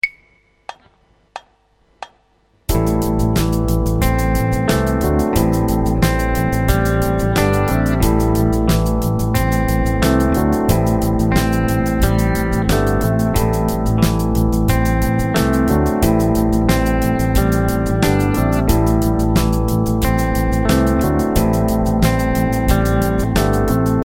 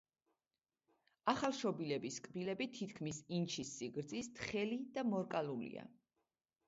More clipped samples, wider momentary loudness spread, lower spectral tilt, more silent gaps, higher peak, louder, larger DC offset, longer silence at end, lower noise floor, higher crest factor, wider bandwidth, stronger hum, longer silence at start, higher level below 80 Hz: neither; second, 2 LU vs 8 LU; first, -6.5 dB/octave vs -4.5 dB/octave; neither; first, 0 dBFS vs -18 dBFS; first, -16 LUFS vs -42 LUFS; neither; second, 0 s vs 0.75 s; second, -57 dBFS vs under -90 dBFS; second, 16 dB vs 24 dB; first, 17.5 kHz vs 7.6 kHz; neither; second, 0.05 s vs 1.25 s; first, -22 dBFS vs -76 dBFS